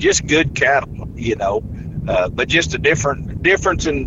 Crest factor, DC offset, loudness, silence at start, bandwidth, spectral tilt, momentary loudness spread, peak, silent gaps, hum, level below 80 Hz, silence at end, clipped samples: 16 dB; under 0.1%; -17 LUFS; 0 s; 8.2 kHz; -4 dB/octave; 10 LU; -2 dBFS; none; none; -32 dBFS; 0 s; under 0.1%